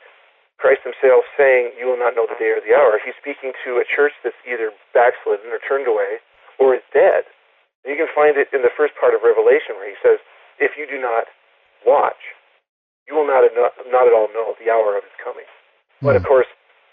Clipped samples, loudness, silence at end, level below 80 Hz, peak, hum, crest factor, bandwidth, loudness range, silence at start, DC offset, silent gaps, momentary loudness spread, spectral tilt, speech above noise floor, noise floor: under 0.1%; -17 LUFS; 0.45 s; -62 dBFS; -4 dBFS; none; 12 dB; 3.9 kHz; 3 LU; 0.6 s; under 0.1%; 7.75-7.83 s, 12.69-13.06 s; 13 LU; -8.5 dB/octave; 37 dB; -54 dBFS